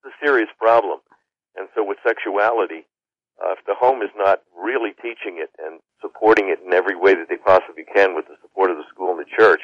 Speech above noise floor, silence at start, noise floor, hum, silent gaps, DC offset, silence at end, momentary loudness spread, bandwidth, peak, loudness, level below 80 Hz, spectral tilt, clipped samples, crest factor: 41 dB; 0.05 s; -60 dBFS; none; none; under 0.1%; 0 s; 15 LU; 7.2 kHz; -4 dBFS; -19 LUFS; -62 dBFS; -5 dB/octave; under 0.1%; 16 dB